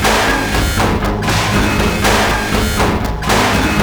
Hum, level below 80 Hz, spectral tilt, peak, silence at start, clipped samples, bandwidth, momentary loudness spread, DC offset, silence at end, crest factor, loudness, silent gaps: none; -22 dBFS; -4 dB/octave; 0 dBFS; 0 s; under 0.1%; over 20 kHz; 3 LU; under 0.1%; 0 s; 14 dB; -14 LUFS; none